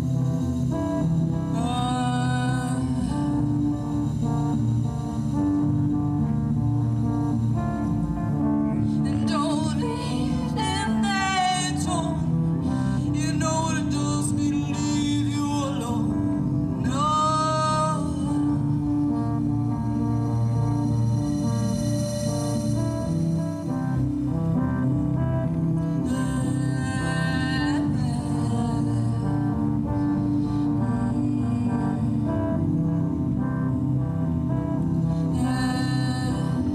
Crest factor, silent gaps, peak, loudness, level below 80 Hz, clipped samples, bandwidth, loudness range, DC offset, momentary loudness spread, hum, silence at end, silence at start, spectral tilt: 12 dB; none; -12 dBFS; -24 LUFS; -40 dBFS; under 0.1%; 13 kHz; 1 LU; under 0.1%; 2 LU; none; 0 s; 0 s; -6.5 dB/octave